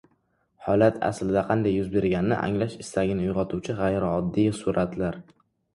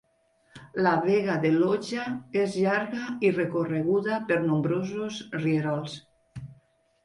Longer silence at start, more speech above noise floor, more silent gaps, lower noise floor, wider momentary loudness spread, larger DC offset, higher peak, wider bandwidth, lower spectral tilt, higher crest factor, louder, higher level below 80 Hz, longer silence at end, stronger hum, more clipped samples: about the same, 0.6 s vs 0.55 s; first, 45 dB vs 41 dB; neither; about the same, -69 dBFS vs -67 dBFS; second, 7 LU vs 15 LU; neither; first, -6 dBFS vs -10 dBFS; about the same, 11.5 kHz vs 11 kHz; about the same, -7 dB/octave vs -7 dB/octave; about the same, 20 dB vs 16 dB; about the same, -25 LUFS vs -27 LUFS; first, -48 dBFS vs -66 dBFS; about the same, 0.55 s vs 0.5 s; neither; neither